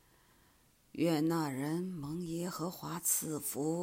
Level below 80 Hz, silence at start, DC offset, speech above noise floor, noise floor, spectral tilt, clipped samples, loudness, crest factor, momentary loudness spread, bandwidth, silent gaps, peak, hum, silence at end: -70 dBFS; 0.95 s; under 0.1%; 32 dB; -68 dBFS; -4.5 dB/octave; under 0.1%; -35 LUFS; 18 dB; 8 LU; 16 kHz; none; -18 dBFS; none; 0 s